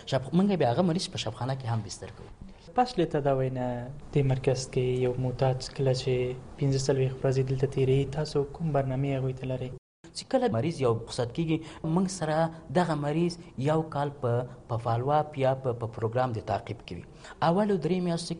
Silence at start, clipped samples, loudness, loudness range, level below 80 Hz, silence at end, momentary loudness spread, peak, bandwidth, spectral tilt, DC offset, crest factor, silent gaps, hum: 0 s; under 0.1%; -29 LUFS; 2 LU; -52 dBFS; 0 s; 8 LU; -12 dBFS; 10.5 kHz; -6.5 dB/octave; under 0.1%; 16 dB; 9.78-10.03 s; none